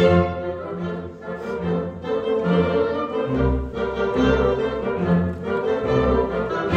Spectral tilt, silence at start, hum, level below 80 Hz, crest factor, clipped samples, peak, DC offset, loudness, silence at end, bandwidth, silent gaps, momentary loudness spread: -8 dB/octave; 0 s; none; -34 dBFS; 18 dB; under 0.1%; -4 dBFS; under 0.1%; -22 LUFS; 0 s; 7.4 kHz; none; 9 LU